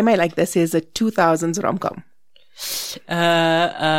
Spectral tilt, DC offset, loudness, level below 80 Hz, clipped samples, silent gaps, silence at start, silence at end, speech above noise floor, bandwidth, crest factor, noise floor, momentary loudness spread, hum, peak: -4.5 dB/octave; under 0.1%; -19 LUFS; -56 dBFS; under 0.1%; none; 0 s; 0 s; 38 dB; 17 kHz; 18 dB; -57 dBFS; 10 LU; none; -2 dBFS